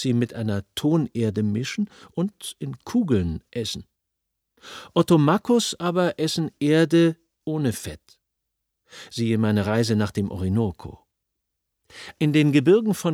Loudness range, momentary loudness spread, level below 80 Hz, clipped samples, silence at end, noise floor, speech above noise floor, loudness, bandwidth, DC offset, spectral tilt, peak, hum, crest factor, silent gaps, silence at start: 5 LU; 17 LU; -52 dBFS; under 0.1%; 0 s; -80 dBFS; 58 dB; -23 LUFS; 16.5 kHz; under 0.1%; -6 dB/octave; -4 dBFS; none; 18 dB; none; 0 s